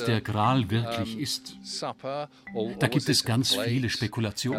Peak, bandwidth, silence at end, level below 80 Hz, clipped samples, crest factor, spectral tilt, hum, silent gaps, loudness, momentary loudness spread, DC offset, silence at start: -6 dBFS; 16.5 kHz; 0 s; -60 dBFS; under 0.1%; 22 dB; -4.5 dB/octave; none; none; -27 LUFS; 11 LU; under 0.1%; 0 s